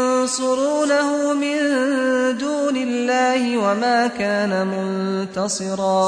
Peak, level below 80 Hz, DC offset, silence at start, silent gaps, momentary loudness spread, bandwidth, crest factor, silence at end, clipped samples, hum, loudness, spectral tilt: -8 dBFS; -64 dBFS; under 0.1%; 0 s; none; 5 LU; 10.5 kHz; 12 dB; 0 s; under 0.1%; none; -20 LUFS; -4 dB/octave